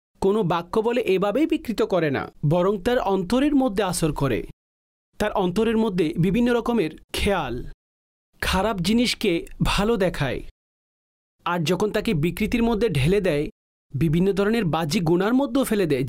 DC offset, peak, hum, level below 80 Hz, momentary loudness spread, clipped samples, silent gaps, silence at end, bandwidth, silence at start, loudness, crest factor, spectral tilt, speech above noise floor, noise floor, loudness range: under 0.1%; -12 dBFS; none; -40 dBFS; 7 LU; under 0.1%; 4.53-5.13 s, 7.04-7.08 s, 7.74-8.33 s, 10.51-11.39 s, 13.52-13.90 s; 0 s; 16 kHz; 0.2 s; -22 LUFS; 10 dB; -6 dB/octave; over 68 dB; under -90 dBFS; 2 LU